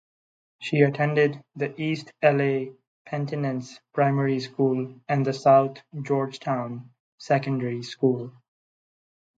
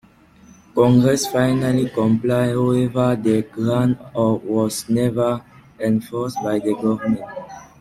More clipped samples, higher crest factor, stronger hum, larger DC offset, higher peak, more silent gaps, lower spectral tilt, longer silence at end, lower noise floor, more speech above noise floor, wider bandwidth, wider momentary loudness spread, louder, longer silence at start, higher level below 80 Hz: neither; about the same, 20 dB vs 16 dB; neither; neither; about the same, -6 dBFS vs -4 dBFS; first, 2.87-3.05 s, 7.00-7.18 s vs none; about the same, -7.5 dB/octave vs -6.5 dB/octave; first, 1.1 s vs 0.15 s; first, under -90 dBFS vs -49 dBFS; first, over 66 dB vs 30 dB; second, 7.8 kHz vs 16 kHz; first, 13 LU vs 9 LU; second, -25 LUFS vs -19 LUFS; second, 0.6 s vs 0.75 s; second, -72 dBFS vs -50 dBFS